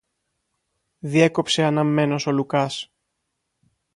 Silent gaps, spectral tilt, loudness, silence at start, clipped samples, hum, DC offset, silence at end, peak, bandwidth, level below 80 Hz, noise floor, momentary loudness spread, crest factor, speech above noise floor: none; -5.5 dB/octave; -21 LUFS; 1.05 s; under 0.1%; none; under 0.1%; 1.1 s; -4 dBFS; 11.5 kHz; -66 dBFS; -77 dBFS; 13 LU; 20 dB; 57 dB